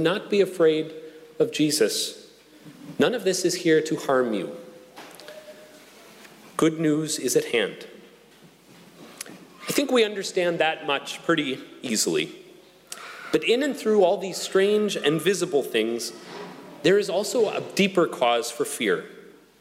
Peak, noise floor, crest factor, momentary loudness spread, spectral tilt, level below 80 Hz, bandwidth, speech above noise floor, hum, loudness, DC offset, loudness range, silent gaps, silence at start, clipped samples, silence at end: -8 dBFS; -53 dBFS; 16 dB; 20 LU; -3.5 dB/octave; -72 dBFS; 16 kHz; 29 dB; none; -24 LUFS; under 0.1%; 4 LU; none; 0 s; under 0.1%; 0.4 s